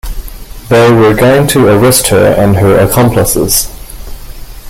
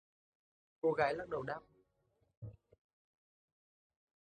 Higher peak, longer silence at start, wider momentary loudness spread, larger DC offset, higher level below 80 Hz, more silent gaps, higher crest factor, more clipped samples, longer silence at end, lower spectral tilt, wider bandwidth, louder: first, 0 dBFS vs -20 dBFS; second, 0.05 s vs 0.85 s; about the same, 20 LU vs 20 LU; neither; first, -24 dBFS vs -72 dBFS; second, none vs 2.37-2.42 s; second, 8 dB vs 24 dB; neither; second, 0 s vs 1.75 s; second, -5 dB/octave vs -7 dB/octave; first, over 20 kHz vs 9.2 kHz; first, -7 LUFS vs -38 LUFS